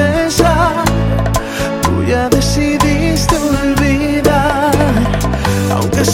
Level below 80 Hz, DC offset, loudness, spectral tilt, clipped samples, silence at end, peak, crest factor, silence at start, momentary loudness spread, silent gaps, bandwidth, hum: -22 dBFS; under 0.1%; -13 LUFS; -5.5 dB/octave; under 0.1%; 0 s; 0 dBFS; 12 dB; 0 s; 3 LU; none; 17 kHz; none